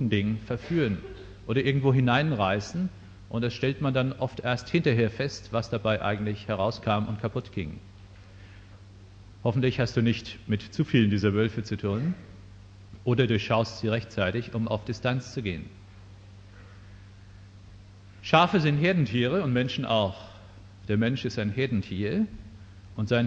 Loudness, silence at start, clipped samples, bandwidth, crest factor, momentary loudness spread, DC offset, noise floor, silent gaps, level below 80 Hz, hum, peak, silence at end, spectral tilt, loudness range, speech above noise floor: -27 LUFS; 0 s; under 0.1%; 7.8 kHz; 24 dB; 12 LU; under 0.1%; -49 dBFS; none; -52 dBFS; none; -4 dBFS; 0 s; -7 dB/octave; 6 LU; 22 dB